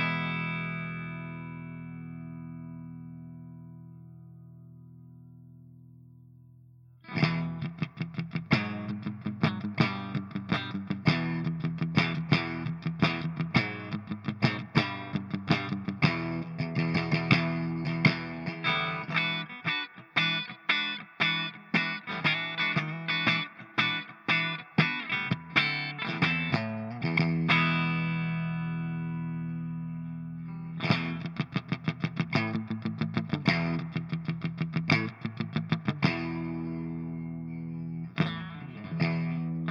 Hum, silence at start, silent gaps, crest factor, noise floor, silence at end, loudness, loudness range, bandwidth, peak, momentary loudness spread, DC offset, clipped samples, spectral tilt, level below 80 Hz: none; 0 s; none; 24 dB; -55 dBFS; 0 s; -30 LUFS; 9 LU; 6.8 kHz; -6 dBFS; 13 LU; under 0.1%; under 0.1%; -6.5 dB/octave; -64 dBFS